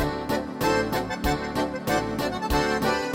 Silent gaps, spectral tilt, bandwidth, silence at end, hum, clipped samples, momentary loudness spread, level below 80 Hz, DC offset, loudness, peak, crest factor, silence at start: none; -5 dB/octave; 17 kHz; 0 s; none; under 0.1%; 4 LU; -38 dBFS; under 0.1%; -26 LUFS; -10 dBFS; 16 dB; 0 s